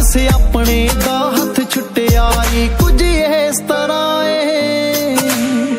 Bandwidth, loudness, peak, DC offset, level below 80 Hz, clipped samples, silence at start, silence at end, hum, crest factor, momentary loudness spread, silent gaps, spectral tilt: 16.5 kHz; -14 LUFS; 0 dBFS; under 0.1%; -16 dBFS; under 0.1%; 0 s; 0 s; none; 12 dB; 3 LU; none; -4.5 dB/octave